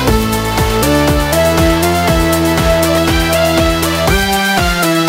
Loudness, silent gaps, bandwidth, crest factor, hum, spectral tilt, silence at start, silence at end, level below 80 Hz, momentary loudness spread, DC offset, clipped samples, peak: -12 LUFS; none; 16.5 kHz; 12 dB; none; -4.5 dB/octave; 0 s; 0 s; -22 dBFS; 2 LU; under 0.1%; under 0.1%; 0 dBFS